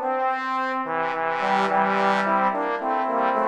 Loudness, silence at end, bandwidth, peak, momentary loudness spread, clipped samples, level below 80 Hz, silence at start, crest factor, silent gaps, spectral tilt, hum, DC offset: -23 LUFS; 0 s; 10.5 kHz; -8 dBFS; 5 LU; under 0.1%; -74 dBFS; 0 s; 16 dB; none; -5.5 dB/octave; none; under 0.1%